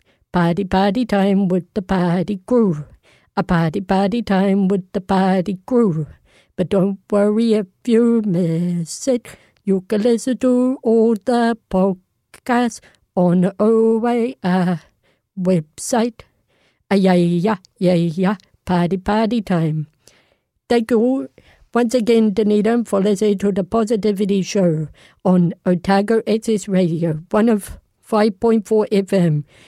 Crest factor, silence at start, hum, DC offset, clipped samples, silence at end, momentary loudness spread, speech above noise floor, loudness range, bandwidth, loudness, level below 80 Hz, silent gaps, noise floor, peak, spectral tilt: 14 dB; 0.35 s; none; under 0.1%; under 0.1%; 0.25 s; 8 LU; 45 dB; 2 LU; 13.5 kHz; -18 LUFS; -48 dBFS; none; -62 dBFS; -4 dBFS; -7 dB/octave